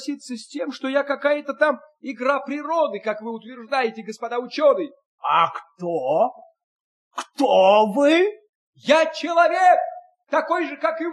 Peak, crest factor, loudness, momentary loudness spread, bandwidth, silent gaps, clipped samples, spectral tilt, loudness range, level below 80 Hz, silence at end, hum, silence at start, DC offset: -4 dBFS; 18 dB; -21 LUFS; 16 LU; 11.5 kHz; 5.06-5.18 s, 6.64-7.11 s, 8.49-8.73 s; under 0.1%; -4.5 dB/octave; 6 LU; -80 dBFS; 0 s; none; 0 s; under 0.1%